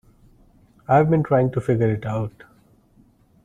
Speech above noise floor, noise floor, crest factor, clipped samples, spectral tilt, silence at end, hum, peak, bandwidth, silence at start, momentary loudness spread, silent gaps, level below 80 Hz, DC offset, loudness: 37 dB; -56 dBFS; 18 dB; under 0.1%; -10 dB/octave; 1.15 s; none; -4 dBFS; 9.8 kHz; 0.9 s; 12 LU; none; -50 dBFS; under 0.1%; -21 LUFS